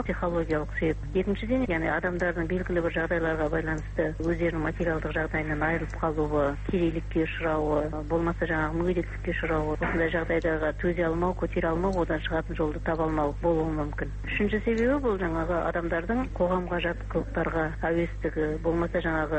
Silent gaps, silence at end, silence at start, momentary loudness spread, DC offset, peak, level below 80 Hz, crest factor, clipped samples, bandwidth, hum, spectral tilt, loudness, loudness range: none; 0 s; 0 s; 3 LU; under 0.1%; -14 dBFS; -36 dBFS; 14 dB; under 0.1%; 8.4 kHz; none; -8 dB/octave; -28 LUFS; 1 LU